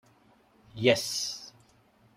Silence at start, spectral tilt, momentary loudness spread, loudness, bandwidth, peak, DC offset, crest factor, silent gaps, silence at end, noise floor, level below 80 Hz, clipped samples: 0.75 s; -3.5 dB/octave; 24 LU; -28 LUFS; 16 kHz; -8 dBFS; under 0.1%; 26 dB; none; 0.65 s; -63 dBFS; -68 dBFS; under 0.1%